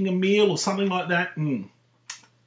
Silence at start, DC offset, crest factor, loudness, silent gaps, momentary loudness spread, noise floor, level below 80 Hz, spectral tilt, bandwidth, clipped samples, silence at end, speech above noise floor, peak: 0 s; under 0.1%; 16 dB; -23 LUFS; none; 20 LU; -44 dBFS; -76 dBFS; -5 dB/octave; 7.8 kHz; under 0.1%; 0.3 s; 21 dB; -10 dBFS